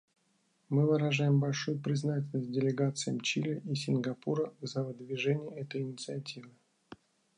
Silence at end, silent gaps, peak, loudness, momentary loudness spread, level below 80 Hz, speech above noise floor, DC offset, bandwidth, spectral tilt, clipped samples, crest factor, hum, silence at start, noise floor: 0.45 s; none; -18 dBFS; -33 LUFS; 10 LU; -80 dBFS; 41 dB; under 0.1%; 10.5 kHz; -6 dB/octave; under 0.1%; 16 dB; none; 0.7 s; -74 dBFS